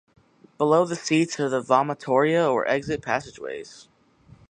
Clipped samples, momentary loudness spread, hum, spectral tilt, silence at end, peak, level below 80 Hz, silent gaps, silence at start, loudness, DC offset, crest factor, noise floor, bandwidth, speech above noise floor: under 0.1%; 14 LU; none; -5 dB/octave; 0.65 s; -4 dBFS; -60 dBFS; none; 0.6 s; -23 LUFS; under 0.1%; 20 dB; -54 dBFS; 10 kHz; 31 dB